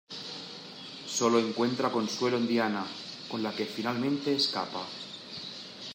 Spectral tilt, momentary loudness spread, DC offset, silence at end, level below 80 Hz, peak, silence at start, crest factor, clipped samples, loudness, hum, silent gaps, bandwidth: -4 dB/octave; 14 LU; under 0.1%; 0 s; -78 dBFS; -12 dBFS; 0.1 s; 18 dB; under 0.1%; -31 LUFS; none; none; 16 kHz